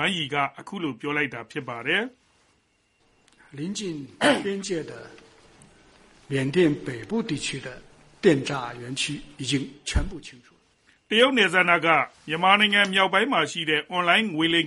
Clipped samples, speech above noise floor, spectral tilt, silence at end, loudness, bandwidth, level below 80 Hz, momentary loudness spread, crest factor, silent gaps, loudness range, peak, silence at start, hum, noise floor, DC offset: under 0.1%; 43 dB; -4 dB/octave; 0 s; -23 LUFS; 11.5 kHz; -44 dBFS; 14 LU; 24 dB; none; 9 LU; -2 dBFS; 0 s; none; -67 dBFS; under 0.1%